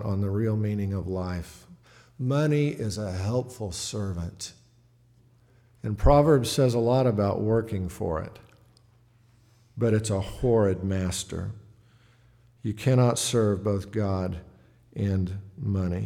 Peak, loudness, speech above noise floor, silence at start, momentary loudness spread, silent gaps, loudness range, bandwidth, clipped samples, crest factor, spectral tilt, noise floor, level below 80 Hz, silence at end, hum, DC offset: -6 dBFS; -26 LUFS; 35 dB; 0 s; 14 LU; none; 5 LU; 15.5 kHz; under 0.1%; 22 dB; -6.5 dB/octave; -60 dBFS; -42 dBFS; 0 s; none; under 0.1%